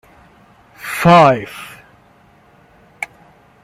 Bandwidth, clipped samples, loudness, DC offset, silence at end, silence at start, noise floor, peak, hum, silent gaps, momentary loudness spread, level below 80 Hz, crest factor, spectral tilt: 16 kHz; under 0.1%; -12 LUFS; under 0.1%; 0.6 s; 0.85 s; -49 dBFS; 0 dBFS; none; none; 23 LU; -52 dBFS; 18 dB; -6 dB/octave